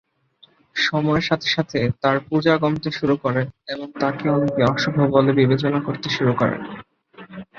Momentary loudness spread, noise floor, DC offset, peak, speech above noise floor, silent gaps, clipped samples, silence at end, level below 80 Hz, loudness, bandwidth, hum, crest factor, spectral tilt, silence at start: 13 LU; -56 dBFS; under 0.1%; -2 dBFS; 36 dB; none; under 0.1%; 0.15 s; -52 dBFS; -20 LUFS; 7.2 kHz; none; 18 dB; -6.5 dB/octave; 0.75 s